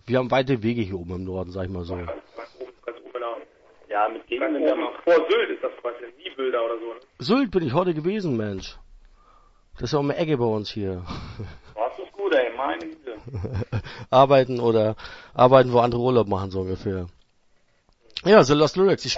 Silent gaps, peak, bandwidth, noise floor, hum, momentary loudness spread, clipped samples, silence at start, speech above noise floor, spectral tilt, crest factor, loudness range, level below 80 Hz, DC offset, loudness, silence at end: none; 0 dBFS; 7.8 kHz; -62 dBFS; none; 20 LU; under 0.1%; 0.05 s; 39 dB; -6.5 dB/octave; 24 dB; 9 LU; -50 dBFS; under 0.1%; -23 LUFS; 0 s